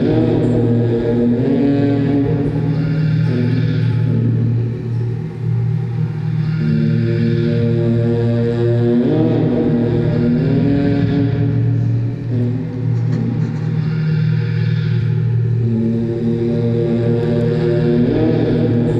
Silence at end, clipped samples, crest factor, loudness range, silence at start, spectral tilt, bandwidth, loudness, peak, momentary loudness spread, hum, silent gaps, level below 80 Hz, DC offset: 0 s; under 0.1%; 12 dB; 3 LU; 0 s; -10 dB/octave; 5.6 kHz; -16 LUFS; -2 dBFS; 5 LU; none; none; -40 dBFS; under 0.1%